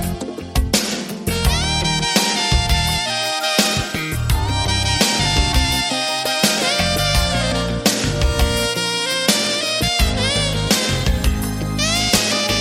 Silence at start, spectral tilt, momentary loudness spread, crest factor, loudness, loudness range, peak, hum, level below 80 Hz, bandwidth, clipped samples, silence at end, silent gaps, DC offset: 0 s; -3 dB/octave; 5 LU; 16 dB; -17 LUFS; 1 LU; -2 dBFS; none; -24 dBFS; 16.5 kHz; under 0.1%; 0 s; none; under 0.1%